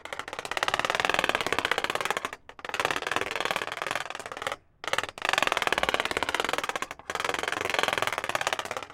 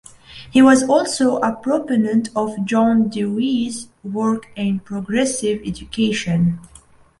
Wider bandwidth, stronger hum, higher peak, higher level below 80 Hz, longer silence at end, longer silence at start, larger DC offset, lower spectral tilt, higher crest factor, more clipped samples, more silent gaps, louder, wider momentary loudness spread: first, 17 kHz vs 11.5 kHz; neither; about the same, -4 dBFS vs -2 dBFS; second, -58 dBFS vs -50 dBFS; second, 0 s vs 0.55 s; second, 0.05 s vs 0.3 s; neither; second, -1.5 dB/octave vs -5.5 dB/octave; first, 26 dB vs 16 dB; neither; neither; second, -29 LUFS vs -18 LUFS; second, 9 LU vs 12 LU